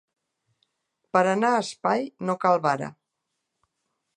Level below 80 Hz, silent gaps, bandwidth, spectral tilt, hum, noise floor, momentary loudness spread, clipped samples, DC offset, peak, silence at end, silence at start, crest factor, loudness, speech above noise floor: -76 dBFS; none; 11.5 kHz; -5.5 dB/octave; none; -81 dBFS; 8 LU; under 0.1%; under 0.1%; -6 dBFS; 1.25 s; 1.15 s; 22 dB; -24 LUFS; 57 dB